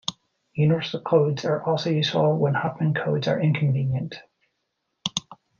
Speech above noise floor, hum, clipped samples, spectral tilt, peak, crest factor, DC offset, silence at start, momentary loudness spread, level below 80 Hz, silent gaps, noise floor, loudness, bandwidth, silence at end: 55 dB; none; under 0.1%; -6 dB/octave; -6 dBFS; 18 dB; under 0.1%; 0.1 s; 11 LU; -62 dBFS; none; -77 dBFS; -24 LUFS; 7.2 kHz; 0.25 s